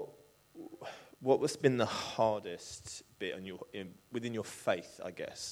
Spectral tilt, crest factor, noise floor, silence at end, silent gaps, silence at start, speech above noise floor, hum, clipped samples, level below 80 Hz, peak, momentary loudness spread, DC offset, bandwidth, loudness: -4.5 dB/octave; 24 dB; -60 dBFS; 0 s; none; 0 s; 24 dB; none; under 0.1%; -72 dBFS; -14 dBFS; 17 LU; under 0.1%; 16.5 kHz; -36 LUFS